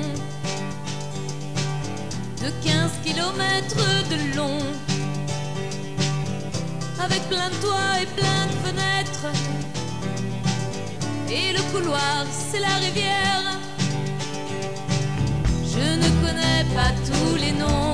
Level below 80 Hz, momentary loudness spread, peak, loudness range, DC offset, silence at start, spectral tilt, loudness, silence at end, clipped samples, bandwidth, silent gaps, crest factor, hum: -38 dBFS; 9 LU; -8 dBFS; 3 LU; 2%; 0 s; -4.5 dB/octave; -24 LUFS; 0 s; under 0.1%; 11 kHz; none; 16 dB; none